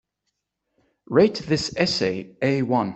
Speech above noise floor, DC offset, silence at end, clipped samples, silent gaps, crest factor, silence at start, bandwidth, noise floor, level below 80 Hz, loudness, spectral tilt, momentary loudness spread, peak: 57 dB; under 0.1%; 0 s; under 0.1%; none; 20 dB; 1.1 s; 8.4 kHz; -79 dBFS; -58 dBFS; -22 LUFS; -5.5 dB/octave; 6 LU; -4 dBFS